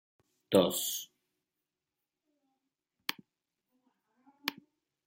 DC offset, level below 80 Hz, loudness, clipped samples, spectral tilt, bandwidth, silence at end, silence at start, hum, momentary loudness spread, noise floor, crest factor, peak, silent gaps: under 0.1%; -80 dBFS; -33 LUFS; under 0.1%; -3.5 dB/octave; 16.5 kHz; 0.55 s; 0.5 s; none; 12 LU; -89 dBFS; 28 dB; -10 dBFS; none